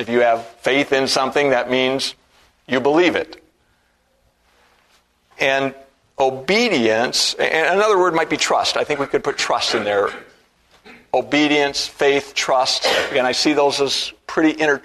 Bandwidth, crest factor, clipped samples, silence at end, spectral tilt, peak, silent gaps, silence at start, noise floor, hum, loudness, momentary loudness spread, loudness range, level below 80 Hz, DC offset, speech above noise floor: 13.5 kHz; 18 dB; under 0.1%; 0.05 s; -3 dB/octave; 0 dBFS; none; 0 s; -62 dBFS; none; -18 LUFS; 6 LU; 6 LU; -56 dBFS; under 0.1%; 44 dB